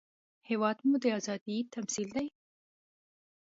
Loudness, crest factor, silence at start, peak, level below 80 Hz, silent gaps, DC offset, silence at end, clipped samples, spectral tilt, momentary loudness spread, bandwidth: -33 LUFS; 20 dB; 0.5 s; -16 dBFS; -78 dBFS; 1.41-1.46 s; under 0.1%; 1.3 s; under 0.1%; -4 dB/octave; 8 LU; 8 kHz